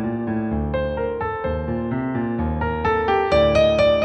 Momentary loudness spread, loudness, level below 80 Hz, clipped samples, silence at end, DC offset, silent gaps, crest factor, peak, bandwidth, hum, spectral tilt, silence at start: 8 LU; -21 LUFS; -34 dBFS; under 0.1%; 0 s; under 0.1%; none; 14 dB; -6 dBFS; 8.8 kHz; none; -7 dB/octave; 0 s